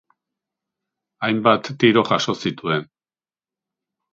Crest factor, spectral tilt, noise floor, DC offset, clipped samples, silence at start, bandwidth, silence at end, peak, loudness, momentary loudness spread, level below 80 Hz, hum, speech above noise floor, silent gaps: 22 dB; -5.5 dB/octave; under -90 dBFS; under 0.1%; under 0.1%; 1.2 s; 7.8 kHz; 1.3 s; -2 dBFS; -19 LUFS; 8 LU; -62 dBFS; none; over 71 dB; none